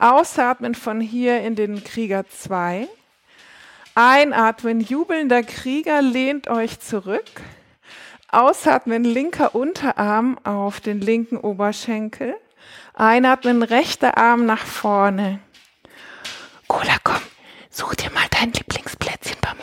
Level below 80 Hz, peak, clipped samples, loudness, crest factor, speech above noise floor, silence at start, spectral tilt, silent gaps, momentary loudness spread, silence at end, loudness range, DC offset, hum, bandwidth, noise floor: -50 dBFS; -2 dBFS; under 0.1%; -19 LUFS; 18 dB; 33 dB; 0 s; -4.5 dB/octave; none; 13 LU; 0 s; 5 LU; under 0.1%; none; 16.5 kHz; -52 dBFS